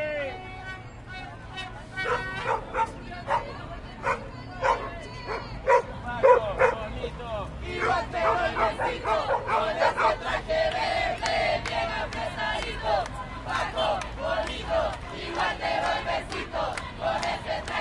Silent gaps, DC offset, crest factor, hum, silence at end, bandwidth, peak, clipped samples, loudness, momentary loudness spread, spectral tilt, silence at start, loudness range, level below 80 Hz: none; under 0.1%; 22 dB; none; 0 s; 11.5 kHz; -6 dBFS; under 0.1%; -27 LUFS; 14 LU; -4.5 dB/octave; 0 s; 6 LU; -44 dBFS